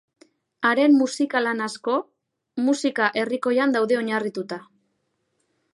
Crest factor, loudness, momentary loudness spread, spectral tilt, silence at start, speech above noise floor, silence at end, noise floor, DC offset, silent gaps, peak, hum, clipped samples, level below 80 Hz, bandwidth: 18 dB; -22 LUFS; 11 LU; -4 dB/octave; 0.6 s; 52 dB; 1.15 s; -73 dBFS; under 0.1%; none; -6 dBFS; none; under 0.1%; -78 dBFS; 11.5 kHz